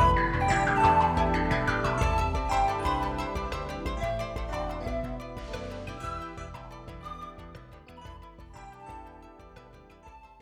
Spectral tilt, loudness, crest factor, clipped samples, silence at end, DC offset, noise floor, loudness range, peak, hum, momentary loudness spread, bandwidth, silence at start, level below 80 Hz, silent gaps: -6 dB/octave; -28 LUFS; 20 dB; under 0.1%; 0.1 s; under 0.1%; -51 dBFS; 20 LU; -10 dBFS; none; 24 LU; 15 kHz; 0 s; -38 dBFS; none